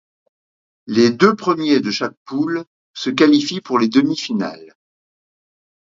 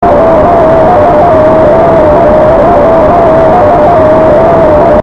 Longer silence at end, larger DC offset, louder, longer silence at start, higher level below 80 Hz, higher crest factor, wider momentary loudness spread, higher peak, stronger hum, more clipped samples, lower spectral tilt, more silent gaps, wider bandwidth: first, 1.3 s vs 0 s; neither; second, -17 LUFS vs -4 LUFS; first, 0.85 s vs 0 s; second, -64 dBFS vs -22 dBFS; first, 18 dB vs 4 dB; first, 11 LU vs 0 LU; about the same, 0 dBFS vs 0 dBFS; neither; second, under 0.1% vs 20%; second, -5 dB/octave vs -8.5 dB/octave; first, 2.17-2.26 s, 2.67-2.94 s vs none; about the same, 7.6 kHz vs 7.2 kHz